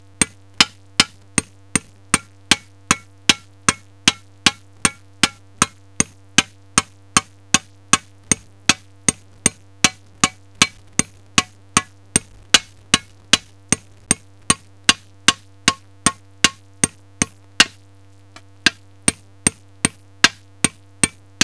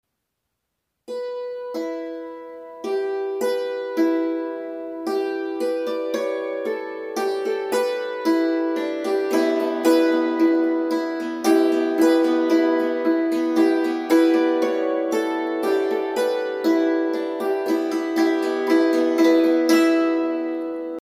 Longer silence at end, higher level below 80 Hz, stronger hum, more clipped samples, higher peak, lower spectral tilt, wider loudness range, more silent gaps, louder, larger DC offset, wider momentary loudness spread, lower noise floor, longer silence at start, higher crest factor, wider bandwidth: first, 0.35 s vs 0.1 s; first, -46 dBFS vs -74 dBFS; neither; neither; first, 0 dBFS vs -6 dBFS; second, -1 dB/octave vs -3.5 dB/octave; second, 2 LU vs 7 LU; neither; about the same, -19 LUFS vs -21 LUFS; first, 0.3% vs under 0.1%; second, 5 LU vs 12 LU; second, -48 dBFS vs -78 dBFS; second, 0.2 s vs 1.1 s; first, 22 dB vs 16 dB; second, 11 kHz vs 15.5 kHz